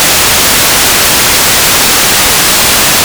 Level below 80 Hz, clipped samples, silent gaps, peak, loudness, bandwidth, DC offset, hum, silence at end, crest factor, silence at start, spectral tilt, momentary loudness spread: -28 dBFS; 9%; none; 0 dBFS; -4 LUFS; over 20 kHz; under 0.1%; none; 0 s; 6 dB; 0 s; -0.5 dB/octave; 0 LU